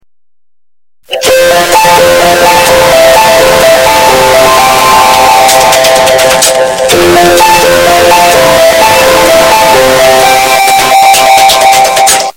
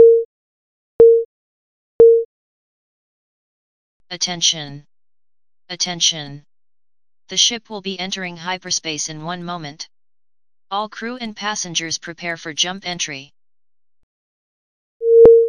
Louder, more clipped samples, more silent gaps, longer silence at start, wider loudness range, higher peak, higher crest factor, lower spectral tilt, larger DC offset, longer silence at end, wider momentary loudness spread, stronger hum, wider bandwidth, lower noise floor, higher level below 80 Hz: first, -3 LUFS vs -17 LUFS; first, 10% vs under 0.1%; second, none vs 0.25-0.99 s, 1.25-1.99 s, 2.25-4.00 s, 14.03-15.00 s; first, 1.1 s vs 0 s; second, 1 LU vs 8 LU; about the same, 0 dBFS vs 0 dBFS; second, 4 dB vs 18 dB; about the same, -2 dB/octave vs -2 dB/octave; neither; about the same, 0.05 s vs 0 s; second, 2 LU vs 21 LU; neither; first, over 20 kHz vs 10 kHz; about the same, under -90 dBFS vs under -90 dBFS; first, -32 dBFS vs -54 dBFS